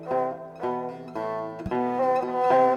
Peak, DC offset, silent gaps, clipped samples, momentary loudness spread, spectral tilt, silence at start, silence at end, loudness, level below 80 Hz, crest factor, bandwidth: -10 dBFS; under 0.1%; none; under 0.1%; 10 LU; -7.5 dB/octave; 0 s; 0 s; -27 LUFS; -56 dBFS; 16 dB; 7.2 kHz